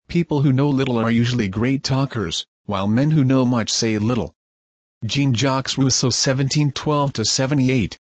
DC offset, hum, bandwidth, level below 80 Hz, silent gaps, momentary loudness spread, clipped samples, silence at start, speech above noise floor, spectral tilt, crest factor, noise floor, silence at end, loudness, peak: under 0.1%; none; 8.8 kHz; -48 dBFS; 2.48-2.64 s, 4.35-5.01 s; 7 LU; under 0.1%; 0.1 s; over 71 dB; -5 dB/octave; 12 dB; under -90 dBFS; 0.1 s; -19 LUFS; -6 dBFS